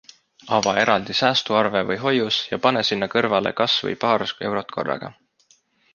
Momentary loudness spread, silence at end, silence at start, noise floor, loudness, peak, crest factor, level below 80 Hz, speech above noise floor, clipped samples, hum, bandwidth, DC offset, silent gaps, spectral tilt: 8 LU; 0.8 s; 0.45 s; -60 dBFS; -21 LUFS; -2 dBFS; 20 dB; -60 dBFS; 39 dB; under 0.1%; none; 7.4 kHz; under 0.1%; none; -4 dB/octave